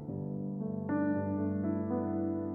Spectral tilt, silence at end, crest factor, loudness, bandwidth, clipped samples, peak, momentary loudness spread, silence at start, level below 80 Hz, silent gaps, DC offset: -13 dB/octave; 0 s; 12 dB; -34 LUFS; 2.5 kHz; under 0.1%; -22 dBFS; 6 LU; 0 s; -70 dBFS; none; under 0.1%